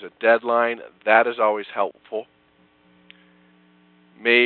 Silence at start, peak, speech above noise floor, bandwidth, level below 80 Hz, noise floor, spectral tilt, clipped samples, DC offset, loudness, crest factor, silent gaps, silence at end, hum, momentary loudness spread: 0 s; 0 dBFS; 39 dB; 4.4 kHz; -76 dBFS; -59 dBFS; -7 dB/octave; under 0.1%; under 0.1%; -21 LUFS; 22 dB; none; 0 s; none; 14 LU